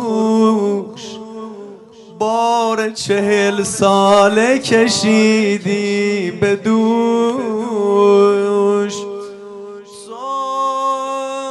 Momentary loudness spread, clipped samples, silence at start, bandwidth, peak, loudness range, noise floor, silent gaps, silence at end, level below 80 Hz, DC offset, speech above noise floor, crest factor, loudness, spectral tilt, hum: 19 LU; under 0.1%; 0 s; 11.5 kHz; 0 dBFS; 5 LU; -38 dBFS; none; 0 s; -58 dBFS; under 0.1%; 24 dB; 14 dB; -15 LUFS; -4.5 dB/octave; none